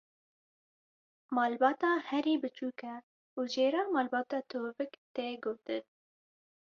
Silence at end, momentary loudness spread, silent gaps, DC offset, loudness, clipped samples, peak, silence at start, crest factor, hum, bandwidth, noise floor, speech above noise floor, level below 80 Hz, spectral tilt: 0.85 s; 12 LU; 3.03-3.37 s, 4.98-5.15 s; under 0.1%; -34 LUFS; under 0.1%; -14 dBFS; 1.3 s; 20 dB; none; 7.2 kHz; under -90 dBFS; over 57 dB; -82 dBFS; -4 dB/octave